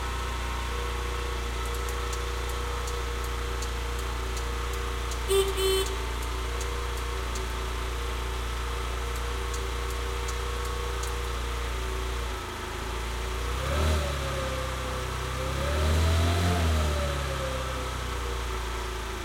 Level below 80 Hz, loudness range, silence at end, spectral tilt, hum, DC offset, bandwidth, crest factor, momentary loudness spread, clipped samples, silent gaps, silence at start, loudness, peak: -32 dBFS; 4 LU; 0 s; -4.5 dB/octave; none; under 0.1%; 16.5 kHz; 16 dB; 7 LU; under 0.1%; none; 0 s; -30 LUFS; -14 dBFS